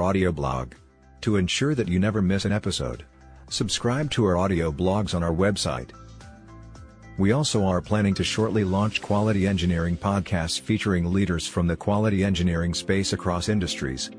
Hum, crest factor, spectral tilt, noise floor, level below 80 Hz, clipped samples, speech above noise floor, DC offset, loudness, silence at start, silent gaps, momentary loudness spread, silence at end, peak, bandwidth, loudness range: none; 16 dB; -5.5 dB/octave; -45 dBFS; -42 dBFS; under 0.1%; 21 dB; under 0.1%; -24 LUFS; 0 s; none; 6 LU; 0 s; -8 dBFS; 10.5 kHz; 2 LU